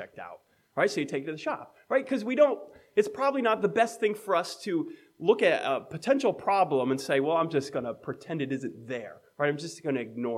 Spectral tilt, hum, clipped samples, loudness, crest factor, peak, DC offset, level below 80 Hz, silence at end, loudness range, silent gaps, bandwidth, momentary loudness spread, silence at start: -5 dB/octave; none; under 0.1%; -28 LUFS; 20 dB; -8 dBFS; under 0.1%; -78 dBFS; 0 s; 3 LU; none; 14 kHz; 13 LU; 0 s